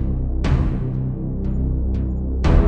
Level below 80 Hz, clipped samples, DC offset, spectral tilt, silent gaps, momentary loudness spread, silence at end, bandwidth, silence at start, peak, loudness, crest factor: -20 dBFS; under 0.1%; under 0.1%; -9 dB/octave; none; 4 LU; 0 s; 7 kHz; 0 s; -2 dBFS; -23 LUFS; 16 dB